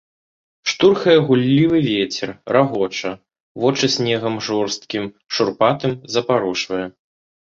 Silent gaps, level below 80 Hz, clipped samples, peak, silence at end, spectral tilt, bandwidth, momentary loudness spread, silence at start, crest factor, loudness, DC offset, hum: 3.40-3.55 s; -56 dBFS; under 0.1%; -2 dBFS; 0.5 s; -5 dB/octave; 7.8 kHz; 12 LU; 0.65 s; 18 dB; -18 LUFS; under 0.1%; none